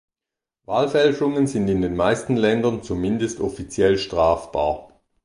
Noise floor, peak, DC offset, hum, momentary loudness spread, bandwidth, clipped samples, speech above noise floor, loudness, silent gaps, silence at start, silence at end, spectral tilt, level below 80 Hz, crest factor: -88 dBFS; -4 dBFS; under 0.1%; none; 7 LU; 11 kHz; under 0.1%; 67 dB; -21 LUFS; none; 0.7 s; 0.4 s; -6 dB/octave; -44 dBFS; 16 dB